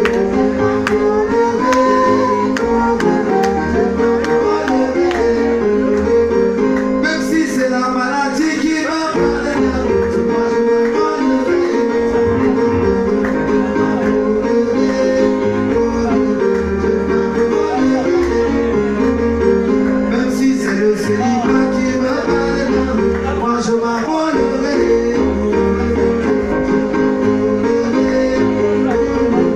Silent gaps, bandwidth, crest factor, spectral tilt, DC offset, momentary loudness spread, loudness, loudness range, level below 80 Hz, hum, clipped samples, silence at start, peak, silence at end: none; 11.5 kHz; 12 dB; -6 dB/octave; under 0.1%; 2 LU; -15 LUFS; 1 LU; -34 dBFS; none; under 0.1%; 0 s; -4 dBFS; 0 s